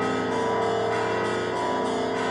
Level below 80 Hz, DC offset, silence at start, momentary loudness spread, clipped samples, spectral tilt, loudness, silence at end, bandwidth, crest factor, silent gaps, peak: -58 dBFS; under 0.1%; 0 s; 2 LU; under 0.1%; -5 dB/octave; -25 LUFS; 0 s; 11 kHz; 12 dB; none; -12 dBFS